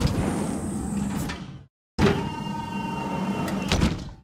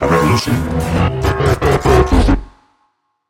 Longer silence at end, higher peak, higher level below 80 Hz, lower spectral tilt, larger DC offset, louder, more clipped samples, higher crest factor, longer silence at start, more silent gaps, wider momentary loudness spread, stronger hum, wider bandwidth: second, 0.05 s vs 0.8 s; second, -4 dBFS vs 0 dBFS; second, -38 dBFS vs -22 dBFS; about the same, -5.5 dB/octave vs -6.5 dB/octave; neither; second, -27 LUFS vs -14 LUFS; neither; first, 22 dB vs 14 dB; about the same, 0 s vs 0 s; first, 1.70-1.98 s vs none; first, 11 LU vs 6 LU; neither; about the same, 16 kHz vs 17 kHz